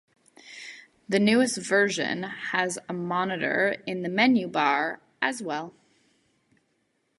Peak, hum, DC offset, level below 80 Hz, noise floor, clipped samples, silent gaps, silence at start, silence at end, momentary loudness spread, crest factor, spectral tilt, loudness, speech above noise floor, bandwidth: -6 dBFS; none; under 0.1%; -70 dBFS; -73 dBFS; under 0.1%; none; 0.45 s; 1.5 s; 19 LU; 22 dB; -4 dB/octave; -25 LUFS; 47 dB; 11.5 kHz